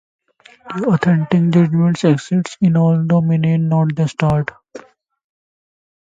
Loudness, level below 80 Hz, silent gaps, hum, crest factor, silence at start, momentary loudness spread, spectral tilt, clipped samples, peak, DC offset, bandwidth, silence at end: -15 LUFS; -50 dBFS; none; none; 16 dB; 0.65 s; 7 LU; -8 dB/octave; under 0.1%; 0 dBFS; under 0.1%; 7.8 kHz; 1.25 s